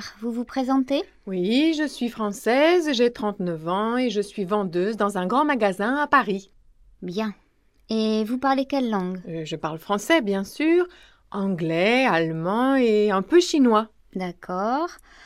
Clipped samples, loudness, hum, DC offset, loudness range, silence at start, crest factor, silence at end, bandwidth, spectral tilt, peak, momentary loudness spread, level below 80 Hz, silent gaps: under 0.1%; -23 LUFS; none; under 0.1%; 4 LU; 0 s; 18 dB; 0.3 s; 14.5 kHz; -5.5 dB/octave; -4 dBFS; 12 LU; -60 dBFS; none